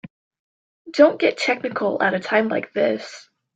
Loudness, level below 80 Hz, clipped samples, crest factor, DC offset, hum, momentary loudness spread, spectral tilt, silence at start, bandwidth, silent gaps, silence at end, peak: -20 LUFS; -70 dBFS; under 0.1%; 20 dB; under 0.1%; none; 11 LU; -5 dB/octave; 0.05 s; 8.4 kHz; 0.10-0.31 s, 0.39-0.85 s; 0.35 s; -2 dBFS